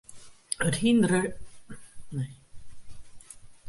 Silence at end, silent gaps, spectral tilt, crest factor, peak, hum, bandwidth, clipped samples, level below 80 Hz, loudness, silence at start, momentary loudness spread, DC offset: 0 s; none; -5 dB/octave; 22 dB; -8 dBFS; none; 11.5 kHz; under 0.1%; -54 dBFS; -27 LUFS; 0.1 s; 26 LU; under 0.1%